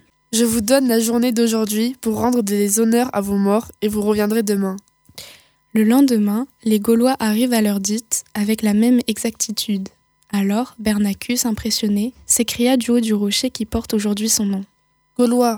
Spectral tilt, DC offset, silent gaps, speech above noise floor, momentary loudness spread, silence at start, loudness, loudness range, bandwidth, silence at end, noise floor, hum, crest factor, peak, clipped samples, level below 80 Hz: -4 dB/octave; under 0.1%; none; 29 dB; 7 LU; 0.3 s; -18 LUFS; 3 LU; 19 kHz; 0 s; -46 dBFS; none; 16 dB; -2 dBFS; under 0.1%; -48 dBFS